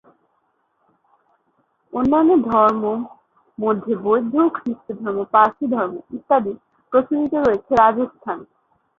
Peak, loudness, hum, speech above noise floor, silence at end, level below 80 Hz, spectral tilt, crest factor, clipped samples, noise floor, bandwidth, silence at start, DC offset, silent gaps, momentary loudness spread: -2 dBFS; -19 LUFS; none; 49 dB; 0.55 s; -56 dBFS; -8 dB/octave; 18 dB; under 0.1%; -67 dBFS; 7 kHz; 1.95 s; under 0.1%; none; 14 LU